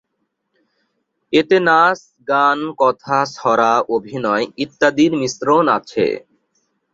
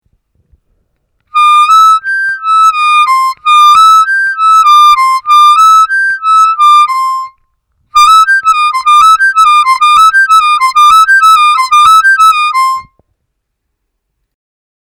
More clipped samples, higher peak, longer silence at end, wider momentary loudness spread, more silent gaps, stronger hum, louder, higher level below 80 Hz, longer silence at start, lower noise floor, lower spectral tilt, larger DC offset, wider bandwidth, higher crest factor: neither; about the same, -2 dBFS vs 0 dBFS; second, 0.75 s vs 2.1 s; about the same, 7 LU vs 6 LU; neither; neither; second, -16 LUFS vs -5 LUFS; second, -60 dBFS vs -48 dBFS; about the same, 1.3 s vs 1.35 s; first, -72 dBFS vs -68 dBFS; first, -4.5 dB/octave vs 4 dB/octave; neither; second, 7.8 kHz vs 19.5 kHz; first, 16 dB vs 6 dB